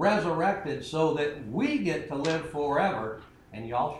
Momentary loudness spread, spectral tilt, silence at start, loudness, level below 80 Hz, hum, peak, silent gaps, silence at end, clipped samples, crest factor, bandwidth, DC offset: 10 LU; -6 dB/octave; 0 s; -29 LUFS; -58 dBFS; none; -12 dBFS; none; 0 s; under 0.1%; 16 dB; 12 kHz; under 0.1%